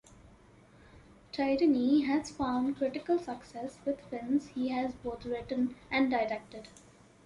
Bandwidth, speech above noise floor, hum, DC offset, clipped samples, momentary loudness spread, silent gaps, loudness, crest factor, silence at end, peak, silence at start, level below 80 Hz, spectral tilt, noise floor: 11 kHz; 27 dB; none; under 0.1%; under 0.1%; 14 LU; none; -32 LUFS; 16 dB; 0.55 s; -16 dBFS; 0.25 s; -60 dBFS; -5.5 dB/octave; -59 dBFS